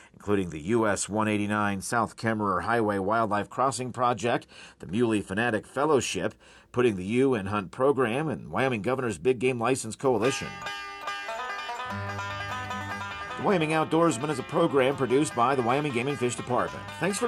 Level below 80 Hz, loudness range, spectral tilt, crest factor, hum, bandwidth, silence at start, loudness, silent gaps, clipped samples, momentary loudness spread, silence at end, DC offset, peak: -62 dBFS; 5 LU; -5 dB/octave; 16 dB; none; 13 kHz; 0.2 s; -27 LUFS; none; under 0.1%; 9 LU; 0 s; under 0.1%; -12 dBFS